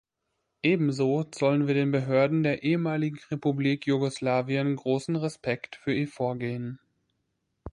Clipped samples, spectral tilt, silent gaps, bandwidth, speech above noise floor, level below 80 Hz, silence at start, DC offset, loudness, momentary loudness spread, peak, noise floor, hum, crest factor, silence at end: under 0.1%; -7 dB/octave; none; 11 kHz; 54 dB; -62 dBFS; 0.65 s; under 0.1%; -27 LUFS; 8 LU; -10 dBFS; -80 dBFS; none; 16 dB; 0.05 s